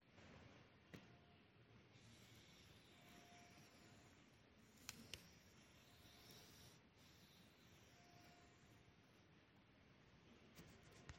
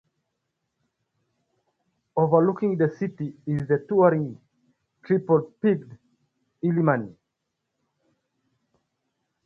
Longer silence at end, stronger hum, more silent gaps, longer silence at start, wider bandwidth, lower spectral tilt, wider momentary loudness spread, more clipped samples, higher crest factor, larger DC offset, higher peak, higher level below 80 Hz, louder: second, 0 s vs 2.35 s; neither; neither; second, 0 s vs 2.15 s; first, 16.5 kHz vs 6 kHz; second, -3.5 dB/octave vs -11 dB/octave; about the same, 9 LU vs 11 LU; neither; first, 38 dB vs 22 dB; neither; second, -30 dBFS vs -4 dBFS; second, -82 dBFS vs -66 dBFS; second, -65 LUFS vs -24 LUFS